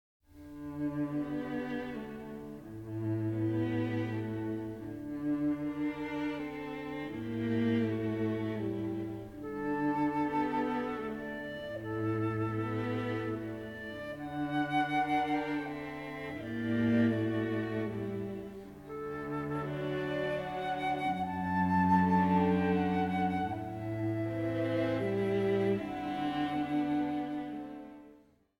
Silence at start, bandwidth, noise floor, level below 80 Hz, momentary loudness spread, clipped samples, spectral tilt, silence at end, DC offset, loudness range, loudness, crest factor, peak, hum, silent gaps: 0.35 s; 16.5 kHz; -61 dBFS; -62 dBFS; 12 LU; under 0.1%; -8 dB/octave; 0.45 s; under 0.1%; 6 LU; -34 LUFS; 18 dB; -16 dBFS; none; none